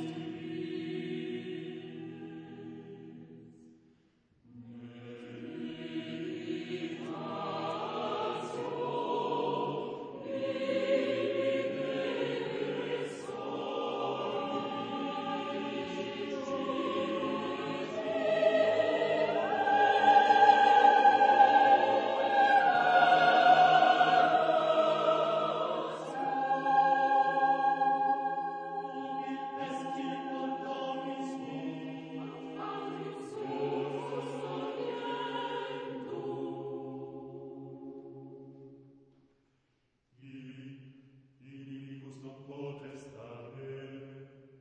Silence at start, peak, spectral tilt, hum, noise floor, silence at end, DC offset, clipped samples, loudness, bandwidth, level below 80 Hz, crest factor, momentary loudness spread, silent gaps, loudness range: 0 s; -10 dBFS; -5 dB/octave; none; -76 dBFS; 0.35 s; under 0.1%; under 0.1%; -30 LUFS; 9.2 kHz; -80 dBFS; 22 dB; 23 LU; none; 23 LU